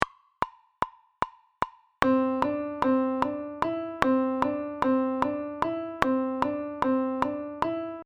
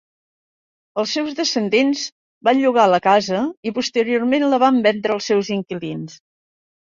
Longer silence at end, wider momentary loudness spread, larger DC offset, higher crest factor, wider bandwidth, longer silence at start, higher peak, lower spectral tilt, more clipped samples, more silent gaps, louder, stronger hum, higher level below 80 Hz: second, 0 s vs 0.7 s; second, 10 LU vs 13 LU; neither; first, 28 dB vs 18 dB; first, 9.4 kHz vs 7.6 kHz; second, 0 s vs 0.95 s; about the same, 0 dBFS vs -2 dBFS; first, -6.5 dB/octave vs -4.5 dB/octave; neither; second, none vs 2.12-2.41 s, 3.57-3.63 s; second, -28 LUFS vs -18 LUFS; neither; first, -56 dBFS vs -64 dBFS